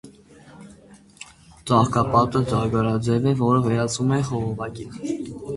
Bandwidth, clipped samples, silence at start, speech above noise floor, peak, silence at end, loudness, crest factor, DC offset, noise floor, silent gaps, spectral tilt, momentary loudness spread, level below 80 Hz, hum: 11.5 kHz; under 0.1%; 0.05 s; 28 dB; -2 dBFS; 0 s; -22 LUFS; 20 dB; under 0.1%; -49 dBFS; none; -6.5 dB/octave; 18 LU; -48 dBFS; none